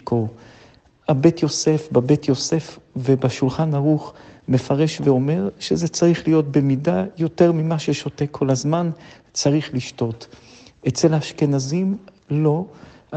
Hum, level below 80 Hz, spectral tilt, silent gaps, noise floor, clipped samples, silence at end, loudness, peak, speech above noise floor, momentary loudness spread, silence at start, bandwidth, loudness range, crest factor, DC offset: none; -56 dBFS; -6.5 dB/octave; none; -51 dBFS; under 0.1%; 0 s; -20 LUFS; 0 dBFS; 31 dB; 10 LU; 0.05 s; 8.6 kHz; 3 LU; 20 dB; under 0.1%